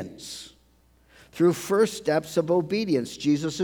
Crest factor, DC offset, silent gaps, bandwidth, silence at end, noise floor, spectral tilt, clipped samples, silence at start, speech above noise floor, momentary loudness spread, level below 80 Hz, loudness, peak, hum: 16 dB; under 0.1%; none; over 20 kHz; 0 s; -60 dBFS; -5.5 dB/octave; under 0.1%; 0 s; 36 dB; 15 LU; -62 dBFS; -24 LUFS; -10 dBFS; none